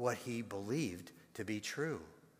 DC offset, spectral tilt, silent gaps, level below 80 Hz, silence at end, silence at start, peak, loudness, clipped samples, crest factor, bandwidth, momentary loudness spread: under 0.1%; -5 dB/octave; none; -74 dBFS; 0.2 s; 0 s; -22 dBFS; -41 LUFS; under 0.1%; 20 dB; 15.5 kHz; 9 LU